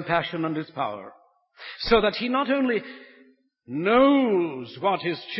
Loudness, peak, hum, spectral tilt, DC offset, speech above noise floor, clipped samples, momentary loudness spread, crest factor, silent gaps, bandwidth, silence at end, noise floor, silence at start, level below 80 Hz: -24 LUFS; -6 dBFS; none; -9.5 dB/octave; under 0.1%; 34 dB; under 0.1%; 16 LU; 20 dB; none; 5.8 kHz; 0 s; -58 dBFS; 0 s; -52 dBFS